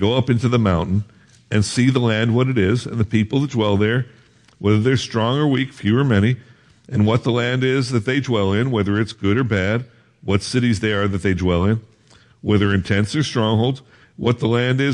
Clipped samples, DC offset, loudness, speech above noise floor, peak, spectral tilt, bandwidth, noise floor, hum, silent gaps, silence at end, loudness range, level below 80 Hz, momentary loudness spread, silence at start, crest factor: under 0.1%; under 0.1%; -19 LUFS; 34 dB; -2 dBFS; -6.5 dB/octave; 11 kHz; -52 dBFS; none; none; 0 s; 1 LU; -50 dBFS; 6 LU; 0 s; 16 dB